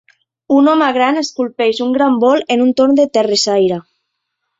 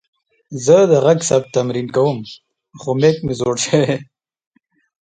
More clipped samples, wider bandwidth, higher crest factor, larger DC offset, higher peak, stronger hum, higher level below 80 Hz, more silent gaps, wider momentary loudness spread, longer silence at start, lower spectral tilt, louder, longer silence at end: neither; second, 8 kHz vs 9.4 kHz; about the same, 12 dB vs 16 dB; neither; about the same, -2 dBFS vs 0 dBFS; neither; second, -60 dBFS vs -54 dBFS; neither; second, 5 LU vs 14 LU; about the same, 0.5 s vs 0.5 s; about the same, -4 dB/octave vs -5 dB/octave; first, -13 LUFS vs -16 LUFS; second, 0.8 s vs 1 s